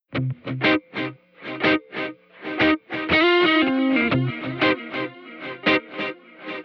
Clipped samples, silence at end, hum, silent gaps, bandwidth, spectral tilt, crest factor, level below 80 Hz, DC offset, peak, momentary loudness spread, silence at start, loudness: under 0.1%; 0 s; none; none; 6.4 kHz; -7 dB/octave; 16 dB; -56 dBFS; under 0.1%; -6 dBFS; 17 LU; 0.1 s; -22 LUFS